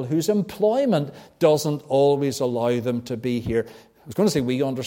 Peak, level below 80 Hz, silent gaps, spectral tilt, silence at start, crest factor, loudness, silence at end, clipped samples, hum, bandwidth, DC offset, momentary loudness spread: -4 dBFS; -54 dBFS; none; -6 dB/octave; 0 s; 18 dB; -22 LUFS; 0 s; under 0.1%; none; 17 kHz; under 0.1%; 7 LU